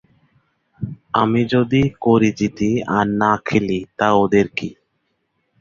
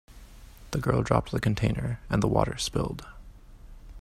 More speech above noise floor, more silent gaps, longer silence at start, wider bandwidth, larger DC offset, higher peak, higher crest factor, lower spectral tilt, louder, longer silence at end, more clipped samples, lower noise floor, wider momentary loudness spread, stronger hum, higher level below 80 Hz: first, 53 dB vs 21 dB; neither; first, 0.8 s vs 0.1 s; second, 7.4 kHz vs 15 kHz; neither; first, -2 dBFS vs -6 dBFS; second, 16 dB vs 24 dB; about the same, -7 dB/octave vs -6 dB/octave; first, -18 LUFS vs -28 LUFS; first, 0.9 s vs 0 s; neither; first, -70 dBFS vs -48 dBFS; about the same, 11 LU vs 10 LU; neither; second, -48 dBFS vs -42 dBFS